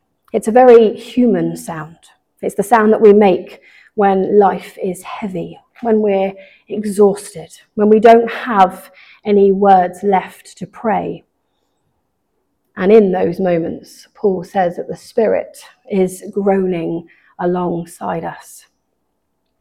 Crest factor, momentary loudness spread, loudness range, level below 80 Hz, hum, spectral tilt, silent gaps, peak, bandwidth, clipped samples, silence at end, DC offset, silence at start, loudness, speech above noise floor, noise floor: 14 dB; 18 LU; 6 LU; -54 dBFS; none; -6.5 dB/octave; none; 0 dBFS; 15 kHz; under 0.1%; 1.2 s; under 0.1%; 0.35 s; -14 LUFS; 55 dB; -69 dBFS